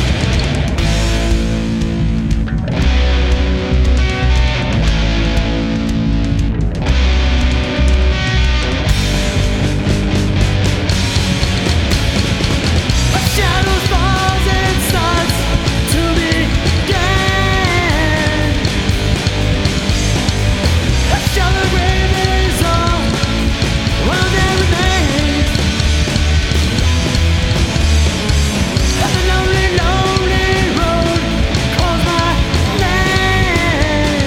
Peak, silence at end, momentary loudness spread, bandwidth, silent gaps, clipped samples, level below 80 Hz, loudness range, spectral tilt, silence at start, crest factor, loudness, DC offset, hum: 0 dBFS; 0 s; 3 LU; 16.5 kHz; none; under 0.1%; -18 dBFS; 2 LU; -5 dB/octave; 0 s; 12 dB; -14 LUFS; under 0.1%; none